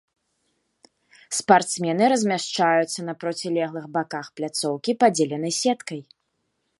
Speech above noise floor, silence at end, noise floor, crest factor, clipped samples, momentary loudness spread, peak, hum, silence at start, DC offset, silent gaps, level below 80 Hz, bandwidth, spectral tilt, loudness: 52 dB; 0.75 s; -74 dBFS; 22 dB; under 0.1%; 11 LU; -2 dBFS; none; 1.3 s; under 0.1%; none; -76 dBFS; 12 kHz; -3.5 dB/octave; -23 LUFS